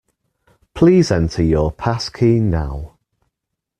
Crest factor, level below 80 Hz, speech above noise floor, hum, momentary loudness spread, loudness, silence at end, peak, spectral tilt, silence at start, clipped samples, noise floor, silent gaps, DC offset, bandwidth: 16 dB; -34 dBFS; 64 dB; none; 17 LU; -16 LUFS; 0.95 s; -2 dBFS; -7 dB/octave; 0.75 s; under 0.1%; -80 dBFS; none; under 0.1%; 10 kHz